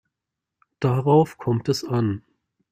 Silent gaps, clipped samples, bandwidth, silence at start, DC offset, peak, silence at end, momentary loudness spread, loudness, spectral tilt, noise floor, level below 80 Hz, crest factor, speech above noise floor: none; under 0.1%; 15 kHz; 0.8 s; under 0.1%; -4 dBFS; 0.55 s; 9 LU; -22 LUFS; -7.5 dB/octave; -85 dBFS; -60 dBFS; 20 dB; 64 dB